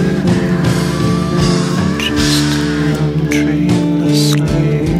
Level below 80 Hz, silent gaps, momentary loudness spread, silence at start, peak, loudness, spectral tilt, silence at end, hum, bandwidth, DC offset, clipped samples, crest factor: -30 dBFS; none; 3 LU; 0 s; -2 dBFS; -13 LUFS; -5.5 dB/octave; 0 s; none; 15 kHz; under 0.1%; under 0.1%; 12 dB